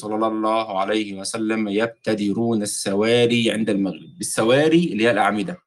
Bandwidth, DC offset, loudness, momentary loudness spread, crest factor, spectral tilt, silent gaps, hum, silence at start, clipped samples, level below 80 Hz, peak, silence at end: 12.5 kHz; under 0.1%; -20 LUFS; 7 LU; 16 dB; -4.5 dB/octave; none; none; 0 s; under 0.1%; -64 dBFS; -6 dBFS; 0.1 s